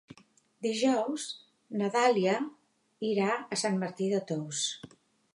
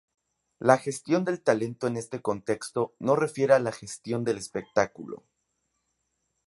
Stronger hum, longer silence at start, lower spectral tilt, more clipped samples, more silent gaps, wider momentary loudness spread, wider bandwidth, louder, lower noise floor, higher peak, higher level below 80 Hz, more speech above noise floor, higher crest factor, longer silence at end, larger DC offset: neither; about the same, 0.6 s vs 0.6 s; second, -4 dB/octave vs -5.5 dB/octave; neither; neither; first, 13 LU vs 10 LU; about the same, 11.5 kHz vs 11.5 kHz; second, -31 LUFS vs -27 LUFS; second, -63 dBFS vs -78 dBFS; second, -14 dBFS vs -4 dBFS; second, -82 dBFS vs -68 dBFS; second, 33 dB vs 51 dB; second, 18 dB vs 26 dB; second, 0.5 s vs 1.3 s; neither